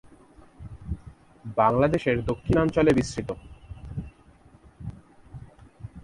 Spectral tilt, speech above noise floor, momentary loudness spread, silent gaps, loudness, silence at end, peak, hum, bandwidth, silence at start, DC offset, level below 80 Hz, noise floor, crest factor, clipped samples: -7 dB/octave; 32 dB; 25 LU; none; -24 LUFS; 0.05 s; -6 dBFS; none; 11.5 kHz; 0.6 s; under 0.1%; -44 dBFS; -54 dBFS; 20 dB; under 0.1%